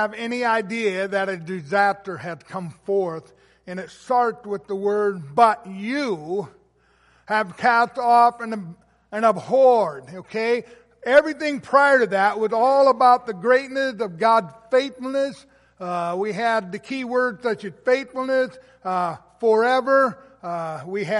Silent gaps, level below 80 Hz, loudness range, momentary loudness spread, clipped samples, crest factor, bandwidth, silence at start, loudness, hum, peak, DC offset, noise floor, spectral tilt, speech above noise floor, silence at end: none; -66 dBFS; 7 LU; 15 LU; under 0.1%; 18 dB; 11.5 kHz; 0 s; -21 LUFS; none; -2 dBFS; under 0.1%; -60 dBFS; -5.5 dB/octave; 39 dB; 0 s